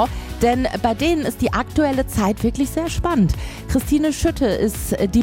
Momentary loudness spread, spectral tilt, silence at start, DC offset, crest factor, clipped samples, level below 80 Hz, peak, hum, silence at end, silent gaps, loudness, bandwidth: 4 LU; -5.5 dB/octave; 0 s; under 0.1%; 14 dB; under 0.1%; -30 dBFS; -4 dBFS; none; 0 s; none; -20 LUFS; 17 kHz